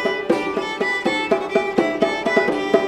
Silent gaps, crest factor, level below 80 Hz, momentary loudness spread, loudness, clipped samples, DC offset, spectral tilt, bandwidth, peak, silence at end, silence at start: none; 18 dB; -54 dBFS; 3 LU; -20 LUFS; under 0.1%; under 0.1%; -4.5 dB/octave; 13.5 kHz; 0 dBFS; 0 s; 0 s